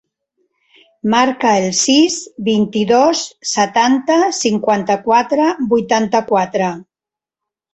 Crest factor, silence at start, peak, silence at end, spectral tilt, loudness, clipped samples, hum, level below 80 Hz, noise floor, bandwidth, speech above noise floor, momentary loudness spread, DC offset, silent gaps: 14 dB; 1.05 s; -2 dBFS; 0.9 s; -3.5 dB/octave; -15 LUFS; under 0.1%; none; -56 dBFS; -88 dBFS; 8.4 kHz; 74 dB; 7 LU; under 0.1%; none